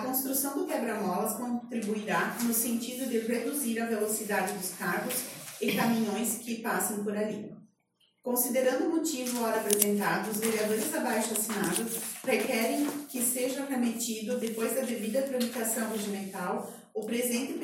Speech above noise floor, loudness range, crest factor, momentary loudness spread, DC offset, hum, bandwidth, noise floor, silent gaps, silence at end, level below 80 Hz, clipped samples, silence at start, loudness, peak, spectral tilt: 41 dB; 3 LU; 26 dB; 6 LU; under 0.1%; none; 17 kHz; -72 dBFS; none; 0 s; -76 dBFS; under 0.1%; 0 s; -30 LUFS; -6 dBFS; -3.5 dB/octave